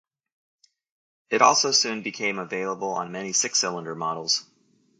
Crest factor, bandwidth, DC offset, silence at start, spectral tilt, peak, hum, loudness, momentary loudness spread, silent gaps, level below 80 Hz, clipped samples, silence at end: 26 dB; 11 kHz; under 0.1%; 1.3 s; -1 dB/octave; -2 dBFS; none; -23 LUFS; 11 LU; none; -76 dBFS; under 0.1%; 0.6 s